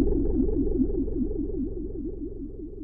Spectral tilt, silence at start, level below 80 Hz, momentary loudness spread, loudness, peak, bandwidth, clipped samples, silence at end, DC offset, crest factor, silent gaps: -15 dB/octave; 0 s; -30 dBFS; 11 LU; -30 LUFS; -10 dBFS; 1.4 kHz; under 0.1%; 0 s; under 0.1%; 16 dB; none